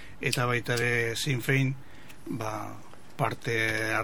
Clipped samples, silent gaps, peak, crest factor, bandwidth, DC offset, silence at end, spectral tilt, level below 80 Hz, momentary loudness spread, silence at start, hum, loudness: under 0.1%; none; -4 dBFS; 26 dB; over 20 kHz; 0.9%; 0 s; -4.5 dB/octave; -58 dBFS; 16 LU; 0 s; none; -29 LUFS